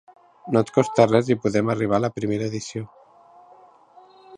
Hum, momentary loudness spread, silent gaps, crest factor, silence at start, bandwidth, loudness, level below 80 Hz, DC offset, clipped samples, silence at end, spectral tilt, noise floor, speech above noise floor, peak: none; 16 LU; none; 22 dB; 0.45 s; 10.5 kHz; -22 LUFS; -58 dBFS; under 0.1%; under 0.1%; 0 s; -6.5 dB/octave; -51 dBFS; 30 dB; -2 dBFS